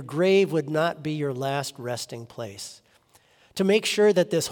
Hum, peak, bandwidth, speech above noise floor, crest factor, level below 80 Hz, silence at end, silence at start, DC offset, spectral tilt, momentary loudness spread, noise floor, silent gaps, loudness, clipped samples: none; -8 dBFS; 18 kHz; 36 dB; 18 dB; -72 dBFS; 0 s; 0 s; under 0.1%; -5 dB/octave; 17 LU; -60 dBFS; none; -24 LUFS; under 0.1%